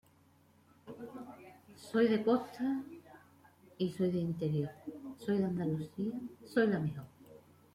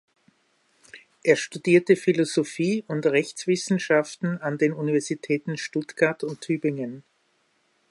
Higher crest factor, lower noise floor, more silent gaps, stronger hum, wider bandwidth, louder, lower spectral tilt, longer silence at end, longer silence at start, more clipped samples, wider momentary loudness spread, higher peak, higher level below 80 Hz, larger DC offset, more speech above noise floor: about the same, 18 dB vs 20 dB; about the same, -66 dBFS vs -68 dBFS; neither; neither; first, 16 kHz vs 11.5 kHz; second, -35 LUFS vs -24 LUFS; first, -8 dB/octave vs -5.5 dB/octave; second, 0.35 s vs 0.9 s; about the same, 0.85 s vs 0.95 s; neither; first, 21 LU vs 8 LU; second, -18 dBFS vs -4 dBFS; about the same, -72 dBFS vs -74 dBFS; neither; second, 32 dB vs 44 dB